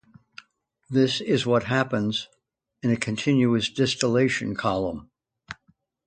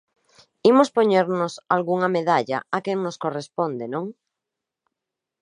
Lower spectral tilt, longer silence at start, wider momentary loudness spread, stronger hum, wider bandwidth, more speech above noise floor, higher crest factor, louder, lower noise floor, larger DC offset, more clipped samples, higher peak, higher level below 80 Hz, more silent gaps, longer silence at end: about the same, -5.5 dB/octave vs -6 dB/octave; first, 0.9 s vs 0.65 s; first, 19 LU vs 12 LU; neither; second, 9.4 kHz vs 10.5 kHz; second, 43 dB vs 64 dB; about the same, 22 dB vs 20 dB; about the same, -24 LUFS vs -22 LUFS; second, -66 dBFS vs -85 dBFS; neither; neither; about the same, -2 dBFS vs -4 dBFS; first, -56 dBFS vs -76 dBFS; neither; second, 0.55 s vs 1.3 s